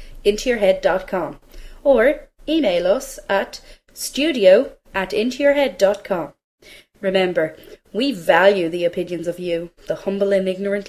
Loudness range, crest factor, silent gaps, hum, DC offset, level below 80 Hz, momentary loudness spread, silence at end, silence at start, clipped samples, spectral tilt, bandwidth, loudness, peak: 2 LU; 18 dB; 6.44-6.58 s; none; under 0.1%; -46 dBFS; 12 LU; 0 s; 0 s; under 0.1%; -4.5 dB/octave; 15 kHz; -19 LUFS; -2 dBFS